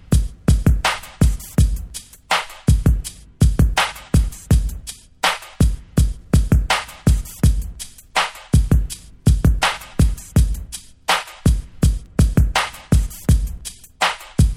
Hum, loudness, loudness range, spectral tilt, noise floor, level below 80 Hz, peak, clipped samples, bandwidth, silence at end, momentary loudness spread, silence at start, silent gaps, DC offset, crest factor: none; -19 LUFS; 1 LU; -5 dB/octave; -35 dBFS; -22 dBFS; -2 dBFS; under 0.1%; 15.5 kHz; 0 s; 12 LU; 0.1 s; none; under 0.1%; 16 dB